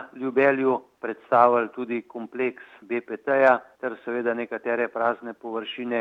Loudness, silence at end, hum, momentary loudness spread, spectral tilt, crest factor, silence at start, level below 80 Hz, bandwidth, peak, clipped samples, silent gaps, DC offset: -25 LUFS; 0 s; none; 14 LU; -7 dB/octave; 22 dB; 0 s; -80 dBFS; 6.6 kHz; -4 dBFS; under 0.1%; none; under 0.1%